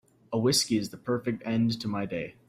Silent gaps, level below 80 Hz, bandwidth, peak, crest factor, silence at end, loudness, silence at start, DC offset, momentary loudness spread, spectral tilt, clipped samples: none; -62 dBFS; 16 kHz; -12 dBFS; 18 dB; 0.15 s; -28 LUFS; 0.3 s; under 0.1%; 8 LU; -4.5 dB/octave; under 0.1%